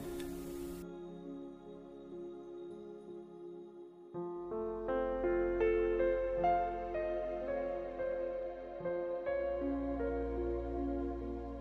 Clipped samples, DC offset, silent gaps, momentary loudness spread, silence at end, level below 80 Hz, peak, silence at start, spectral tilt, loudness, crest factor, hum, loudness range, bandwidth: under 0.1%; under 0.1%; none; 17 LU; 0 s; -50 dBFS; -22 dBFS; 0 s; -7.5 dB/octave; -38 LUFS; 16 dB; none; 13 LU; 15.5 kHz